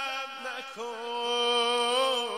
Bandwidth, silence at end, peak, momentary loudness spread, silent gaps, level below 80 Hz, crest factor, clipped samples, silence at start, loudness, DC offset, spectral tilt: 16 kHz; 0 s; -16 dBFS; 12 LU; none; -84 dBFS; 14 dB; under 0.1%; 0 s; -28 LUFS; under 0.1%; 0 dB/octave